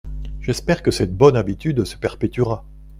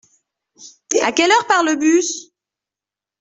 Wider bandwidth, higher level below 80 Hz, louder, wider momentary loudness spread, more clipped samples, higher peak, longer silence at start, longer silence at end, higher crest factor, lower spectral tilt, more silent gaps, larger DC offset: first, 15.5 kHz vs 8.4 kHz; first, -34 dBFS vs -64 dBFS; second, -20 LUFS vs -16 LUFS; first, 12 LU vs 9 LU; neither; about the same, 0 dBFS vs -2 dBFS; second, 0.05 s vs 0.6 s; second, 0 s vs 1 s; about the same, 18 dB vs 18 dB; first, -6.5 dB/octave vs -1 dB/octave; neither; neither